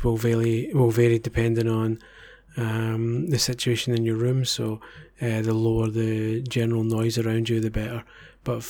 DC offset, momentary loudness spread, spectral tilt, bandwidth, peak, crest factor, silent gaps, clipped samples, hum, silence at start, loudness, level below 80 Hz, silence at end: under 0.1%; 9 LU; -6 dB/octave; 18 kHz; -8 dBFS; 16 dB; none; under 0.1%; none; 0 s; -24 LUFS; -44 dBFS; 0 s